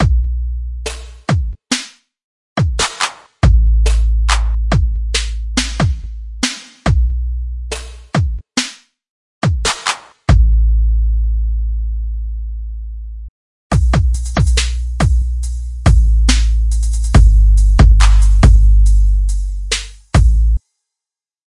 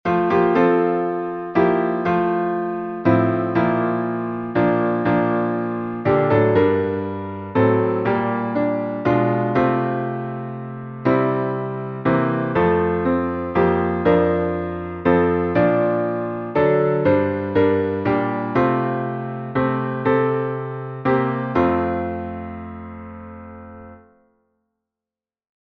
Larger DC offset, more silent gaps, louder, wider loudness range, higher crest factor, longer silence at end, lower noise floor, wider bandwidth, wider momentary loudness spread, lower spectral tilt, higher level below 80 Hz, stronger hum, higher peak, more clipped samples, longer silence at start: neither; first, 2.24-2.56 s, 9.09-9.41 s, 13.29-13.70 s vs none; first, -16 LUFS vs -20 LUFS; first, 8 LU vs 5 LU; about the same, 12 dB vs 16 dB; second, 1 s vs 1.8 s; about the same, -87 dBFS vs under -90 dBFS; first, 11.5 kHz vs 5.8 kHz; first, 14 LU vs 10 LU; second, -5 dB/octave vs -10 dB/octave; first, -14 dBFS vs -48 dBFS; neither; first, 0 dBFS vs -4 dBFS; neither; about the same, 0 s vs 0.05 s